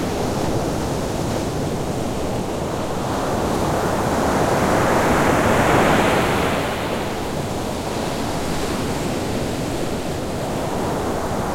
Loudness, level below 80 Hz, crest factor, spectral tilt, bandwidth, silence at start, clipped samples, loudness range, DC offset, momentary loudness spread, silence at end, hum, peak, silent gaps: -21 LUFS; -36 dBFS; 18 dB; -5 dB/octave; 16.5 kHz; 0 s; under 0.1%; 6 LU; under 0.1%; 8 LU; 0 s; none; -2 dBFS; none